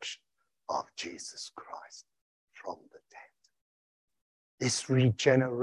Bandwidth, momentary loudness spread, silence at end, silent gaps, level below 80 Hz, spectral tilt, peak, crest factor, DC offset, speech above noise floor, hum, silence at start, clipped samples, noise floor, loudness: 11.5 kHz; 22 LU; 0 s; 2.21-2.48 s, 3.61-4.08 s, 4.21-4.58 s; -68 dBFS; -5 dB/octave; -10 dBFS; 24 dB; under 0.1%; 49 dB; none; 0 s; under 0.1%; -80 dBFS; -30 LUFS